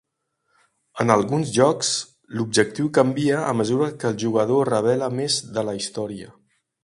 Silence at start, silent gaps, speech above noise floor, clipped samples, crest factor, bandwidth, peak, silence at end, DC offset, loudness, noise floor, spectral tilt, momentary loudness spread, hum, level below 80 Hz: 0.95 s; none; 53 dB; under 0.1%; 22 dB; 11.5 kHz; 0 dBFS; 0.55 s; under 0.1%; -21 LUFS; -74 dBFS; -4.5 dB/octave; 10 LU; none; -62 dBFS